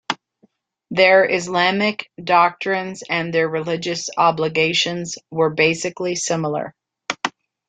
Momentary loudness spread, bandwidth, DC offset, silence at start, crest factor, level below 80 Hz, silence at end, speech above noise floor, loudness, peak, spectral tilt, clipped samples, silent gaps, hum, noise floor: 12 LU; 9.4 kHz; under 0.1%; 0.1 s; 18 dB; -64 dBFS; 0.4 s; 41 dB; -19 LUFS; -2 dBFS; -3.5 dB/octave; under 0.1%; none; none; -60 dBFS